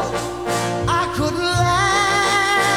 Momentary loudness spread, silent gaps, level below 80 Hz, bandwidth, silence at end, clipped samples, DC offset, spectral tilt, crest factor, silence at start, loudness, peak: 7 LU; none; -38 dBFS; 18 kHz; 0 s; under 0.1%; 0.3%; -3.5 dB/octave; 14 dB; 0 s; -18 LUFS; -4 dBFS